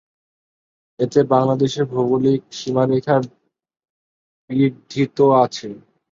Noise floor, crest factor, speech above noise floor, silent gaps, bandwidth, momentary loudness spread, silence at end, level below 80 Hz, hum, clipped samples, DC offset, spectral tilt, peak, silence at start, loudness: under -90 dBFS; 18 dB; over 73 dB; 3.90-4.48 s; 7.6 kHz; 10 LU; 0.35 s; -60 dBFS; none; under 0.1%; under 0.1%; -7 dB/octave; -2 dBFS; 1 s; -18 LUFS